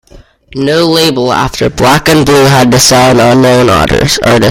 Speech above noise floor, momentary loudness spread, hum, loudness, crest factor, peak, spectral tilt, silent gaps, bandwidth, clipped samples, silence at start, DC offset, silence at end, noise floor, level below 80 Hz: 29 dB; 6 LU; none; -6 LUFS; 6 dB; 0 dBFS; -4.5 dB/octave; none; over 20 kHz; 0.4%; 0.15 s; under 0.1%; 0 s; -36 dBFS; -28 dBFS